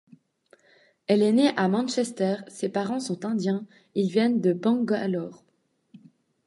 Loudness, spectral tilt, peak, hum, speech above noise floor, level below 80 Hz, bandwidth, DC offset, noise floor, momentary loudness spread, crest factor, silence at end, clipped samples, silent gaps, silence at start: -25 LUFS; -6 dB/octave; -8 dBFS; none; 46 dB; -76 dBFS; 11.5 kHz; under 0.1%; -70 dBFS; 10 LU; 18 dB; 0.5 s; under 0.1%; none; 1.1 s